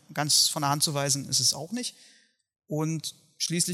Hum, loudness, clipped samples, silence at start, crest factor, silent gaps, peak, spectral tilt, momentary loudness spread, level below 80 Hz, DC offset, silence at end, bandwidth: none; -25 LUFS; under 0.1%; 0.1 s; 20 dB; none; -8 dBFS; -2.5 dB/octave; 14 LU; -74 dBFS; under 0.1%; 0 s; 16.5 kHz